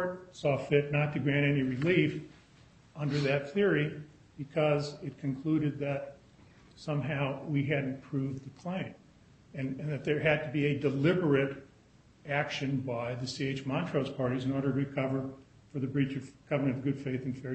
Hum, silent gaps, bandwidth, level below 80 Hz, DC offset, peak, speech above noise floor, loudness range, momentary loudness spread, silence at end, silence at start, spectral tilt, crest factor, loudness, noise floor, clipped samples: none; none; 8.4 kHz; -64 dBFS; under 0.1%; -12 dBFS; 29 dB; 5 LU; 12 LU; 0 s; 0 s; -7.5 dB/octave; 20 dB; -32 LUFS; -61 dBFS; under 0.1%